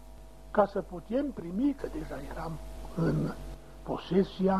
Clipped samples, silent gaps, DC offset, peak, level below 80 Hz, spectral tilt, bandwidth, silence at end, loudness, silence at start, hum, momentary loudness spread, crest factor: under 0.1%; none; 0.3%; -12 dBFS; -46 dBFS; -8 dB/octave; 14 kHz; 0 s; -32 LUFS; 0 s; none; 16 LU; 20 dB